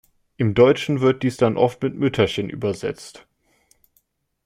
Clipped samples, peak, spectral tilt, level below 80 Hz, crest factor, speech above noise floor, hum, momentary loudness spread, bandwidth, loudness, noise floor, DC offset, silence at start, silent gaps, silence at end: under 0.1%; -4 dBFS; -6.5 dB/octave; -54 dBFS; 18 dB; 47 dB; none; 12 LU; 15 kHz; -20 LUFS; -66 dBFS; under 0.1%; 0.4 s; none; 1.35 s